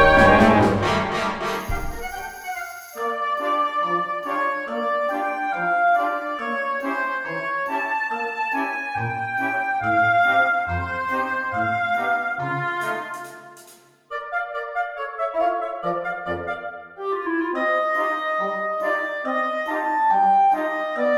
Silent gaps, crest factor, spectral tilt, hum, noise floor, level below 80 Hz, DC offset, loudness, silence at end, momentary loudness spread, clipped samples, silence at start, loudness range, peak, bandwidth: none; 20 dB; -5.5 dB/octave; none; -50 dBFS; -42 dBFS; under 0.1%; -22 LUFS; 0 s; 12 LU; under 0.1%; 0 s; 6 LU; -2 dBFS; over 20 kHz